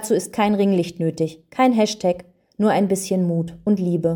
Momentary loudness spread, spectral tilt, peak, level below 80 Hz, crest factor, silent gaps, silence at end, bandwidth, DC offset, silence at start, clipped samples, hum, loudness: 7 LU; -6 dB/octave; -6 dBFS; -58 dBFS; 14 dB; none; 0 s; 19 kHz; under 0.1%; 0 s; under 0.1%; none; -21 LUFS